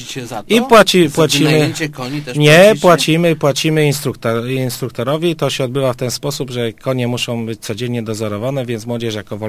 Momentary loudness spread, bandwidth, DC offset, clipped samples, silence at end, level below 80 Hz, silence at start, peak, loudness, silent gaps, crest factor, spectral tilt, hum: 13 LU; 15.5 kHz; under 0.1%; 0.3%; 0 s; -50 dBFS; 0 s; 0 dBFS; -14 LUFS; none; 14 dB; -5 dB/octave; none